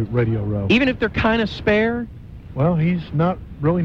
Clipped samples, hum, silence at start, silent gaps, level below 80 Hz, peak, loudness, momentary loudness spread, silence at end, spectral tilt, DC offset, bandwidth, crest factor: under 0.1%; none; 0 s; none; -38 dBFS; -4 dBFS; -20 LUFS; 9 LU; 0 s; -8 dB/octave; under 0.1%; 7.2 kHz; 16 dB